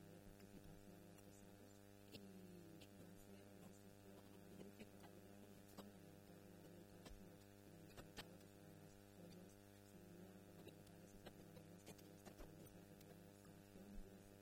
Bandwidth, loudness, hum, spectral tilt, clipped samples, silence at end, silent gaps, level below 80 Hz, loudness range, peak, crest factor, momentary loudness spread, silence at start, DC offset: 18 kHz; -63 LUFS; 50 Hz at -70 dBFS; -5 dB/octave; under 0.1%; 0 s; none; -72 dBFS; 1 LU; -42 dBFS; 20 dB; 3 LU; 0 s; under 0.1%